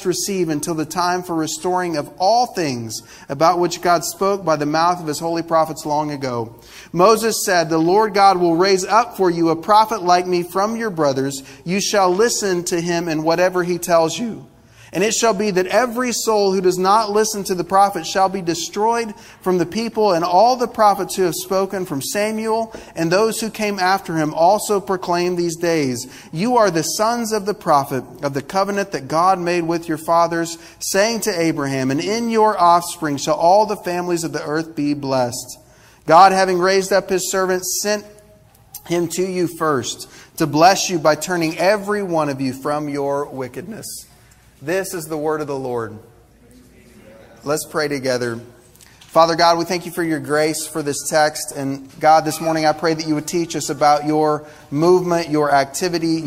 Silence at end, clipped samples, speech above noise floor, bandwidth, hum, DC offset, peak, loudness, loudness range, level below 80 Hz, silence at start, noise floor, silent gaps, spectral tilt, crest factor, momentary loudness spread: 0 s; under 0.1%; 31 dB; 16 kHz; none; under 0.1%; 0 dBFS; -18 LUFS; 5 LU; -54 dBFS; 0 s; -49 dBFS; none; -4 dB/octave; 18 dB; 10 LU